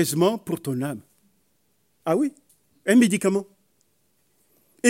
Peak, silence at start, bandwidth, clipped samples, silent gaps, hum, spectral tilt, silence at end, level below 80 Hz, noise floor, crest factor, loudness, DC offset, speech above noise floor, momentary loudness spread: -4 dBFS; 0 s; 16.5 kHz; under 0.1%; none; none; -5 dB/octave; 0 s; -74 dBFS; -69 dBFS; 20 dB; -23 LUFS; under 0.1%; 48 dB; 14 LU